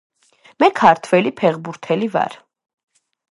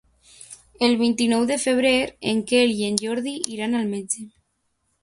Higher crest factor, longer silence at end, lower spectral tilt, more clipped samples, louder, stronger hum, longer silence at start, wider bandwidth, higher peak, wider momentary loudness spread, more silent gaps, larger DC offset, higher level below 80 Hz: about the same, 18 dB vs 22 dB; first, 0.95 s vs 0.75 s; first, -6 dB/octave vs -3.5 dB/octave; neither; first, -17 LUFS vs -22 LUFS; neither; first, 0.6 s vs 0.4 s; about the same, 11.5 kHz vs 11.5 kHz; about the same, 0 dBFS vs 0 dBFS; about the same, 10 LU vs 10 LU; neither; neither; second, -66 dBFS vs -60 dBFS